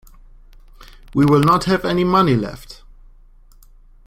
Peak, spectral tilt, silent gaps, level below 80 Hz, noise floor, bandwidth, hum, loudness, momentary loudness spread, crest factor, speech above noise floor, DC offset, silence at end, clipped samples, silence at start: -2 dBFS; -7 dB/octave; none; -42 dBFS; -46 dBFS; 16 kHz; none; -16 LUFS; 13 LU; 18 dB; 31 dB; under 0.1%; 1.35 s; under 0.1%; 1.15 s